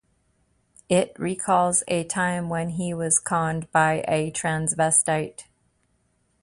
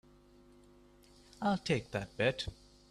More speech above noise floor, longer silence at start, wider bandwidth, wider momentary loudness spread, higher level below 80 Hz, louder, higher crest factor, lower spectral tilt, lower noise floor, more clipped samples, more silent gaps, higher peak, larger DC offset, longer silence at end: first, 45 dB vs 27 dB; second, 0.9 s vs 1.4 s; second, 11.5 kHz vs 13 kHz; about the same, 8 LU vs 9 LU; about the same, -58 dBFS vs -60 dBFS; first, -23 LUFS vs -35 LUFS; about the same, 20 dB vs 22 dB; second, -4 dB/octave vs -5.5 dB/octave; first, -68 dBFS vs -62 dBFS; neither; neither; first, -4 dBFS vs -16 dBFS; neither; first, 1 s vs 0.4 s